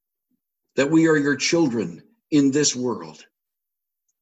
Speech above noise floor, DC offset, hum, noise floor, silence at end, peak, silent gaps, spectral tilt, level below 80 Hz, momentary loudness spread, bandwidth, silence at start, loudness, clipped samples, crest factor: 65 dB; under 0.1%; none; -85 dBFS; 1.1 s; -8 dBFS; none; -4 dB/octave; -66 dBFS; 14 LU; 8.6 kHz; 0.75 s; -20 LUFS; under 0.1%; 16 dB